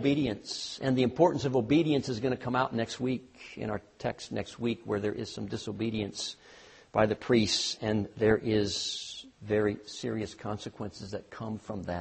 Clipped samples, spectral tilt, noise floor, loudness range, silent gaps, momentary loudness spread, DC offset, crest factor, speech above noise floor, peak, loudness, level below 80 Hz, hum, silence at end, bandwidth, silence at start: under 0.1%; -5 dB/octave; -55 dBFS; 6 LU; none; 13 LU; under 0.1%; 20 dB; 24 dB; -10 dBFS; -31 LUFS; -58 dBFS; none; 0 s; 8.4 kHz; 0 s